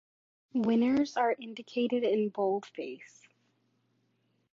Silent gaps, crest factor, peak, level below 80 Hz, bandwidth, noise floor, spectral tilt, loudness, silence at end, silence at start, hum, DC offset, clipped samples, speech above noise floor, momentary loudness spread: none; 16 dB; -16 dBFS; -76 dBFS; 7.6 kHz; -75 dBFS; -6 dB/octave; -30 LUFS; 1.45 s; 0.55 s; none; under 0.1%; under 0.1%; 44 dB; 14 LU